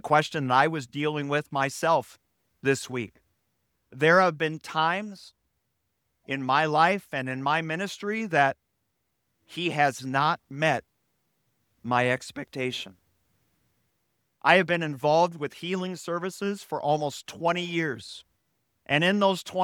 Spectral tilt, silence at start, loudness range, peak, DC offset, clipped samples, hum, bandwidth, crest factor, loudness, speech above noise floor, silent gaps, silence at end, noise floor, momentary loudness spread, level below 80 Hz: -5 dB/octave; 0.05 s; 4 LU; -2 dBFS; under 0.1%; under 0.1%; none; 18 kHz; 24 dB; -26 LUFS; 52 dB; none; 0 s; -77 dBFS; 13 LU; -72 dBFS